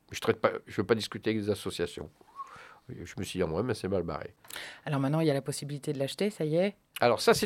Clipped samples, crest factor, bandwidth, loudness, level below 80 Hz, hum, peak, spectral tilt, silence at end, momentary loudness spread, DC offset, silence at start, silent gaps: under 0.1%; 22 dB; 16.5 kHz; -31 LUFS; -60 dBFS; none; -8 dBFS; -5 dB/octave; 0 s; 17 LU; under 0.1%; 0.1 s; none